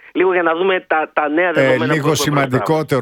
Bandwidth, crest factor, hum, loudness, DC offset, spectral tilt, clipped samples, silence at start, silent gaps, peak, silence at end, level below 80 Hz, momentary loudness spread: 18 kHz; 14 dB; none; -16 LUFS; under 0.1%; -5 dB/octave; under 0.1%; 0.15 s; none; -2 dBFS; 0 s; -54 dBFS; 3 LU